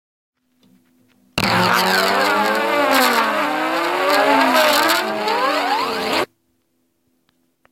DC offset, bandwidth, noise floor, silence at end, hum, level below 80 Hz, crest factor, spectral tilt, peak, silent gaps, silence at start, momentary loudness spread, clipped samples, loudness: under 0.1%; 17 kHz; -67 dBFS; 1.45 s; none; -58 dBFS; 18 dB; -3 dB/octave; 0 dBFS; none; 1.35 s; 6 LU; under 0.1%; -16 LUFS